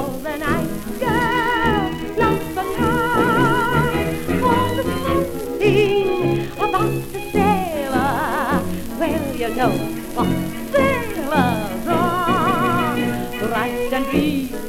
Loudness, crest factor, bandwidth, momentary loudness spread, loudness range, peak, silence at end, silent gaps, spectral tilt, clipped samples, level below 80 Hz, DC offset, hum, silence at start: -20 LUFS; 16 dB; 17 kHz; 7 LU; 2 LU; -4 dBFS; 0 s; none; -6 dB/octave; under 0.1%; -36 dBFS; under 0.1%; none; 0 s